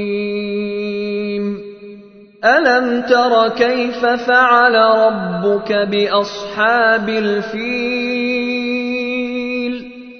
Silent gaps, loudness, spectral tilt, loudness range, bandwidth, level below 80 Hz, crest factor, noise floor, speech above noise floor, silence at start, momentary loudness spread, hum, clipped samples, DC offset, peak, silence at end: none; -15 LUFS; -5.5 dB/octave; 4 LU; 6.6 kHz; -54 dBFS; 16 dB; -40 dBFS; 26 dB; 0 s; 10 LU; none; under 0.1%; under 0.1%; 0 dBFS; 0 s